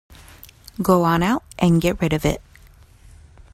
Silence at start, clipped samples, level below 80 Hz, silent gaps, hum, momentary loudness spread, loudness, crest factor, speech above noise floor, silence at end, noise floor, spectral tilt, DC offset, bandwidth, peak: 0.1 s; under 0.1%; -40 dBFS; none; none; 9 LU; -20 LUFS; 18 dB; 30 dB; 1.15 s; -48 dBFS; -6.5 dB/octave; under 0.1%; 15.5 kHz; -4 dBFS